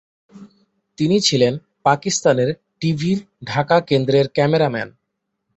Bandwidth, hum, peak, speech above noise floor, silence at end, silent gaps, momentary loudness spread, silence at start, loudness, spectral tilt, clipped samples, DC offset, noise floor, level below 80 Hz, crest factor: 8.2 kHz; none; -2 dBFS; 58 dB; 0.7 s; none; 8 LU; 0.35 s; -18 LUFS; -5 dB/octave; under 0.1%; under 0.1%; -76 dBFS; -56 dBFS; 18 dB